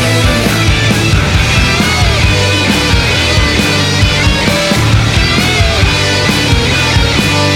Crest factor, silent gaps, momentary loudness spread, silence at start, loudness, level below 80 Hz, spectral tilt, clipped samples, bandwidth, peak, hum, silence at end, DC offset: 10 dB; none; 1 LU; 0 s; -9 LUFS; -18 dBFS; -4 dB/octave; under 0.1%; 17 kHz; 0 dBFS; none; 0 s; under 0.1%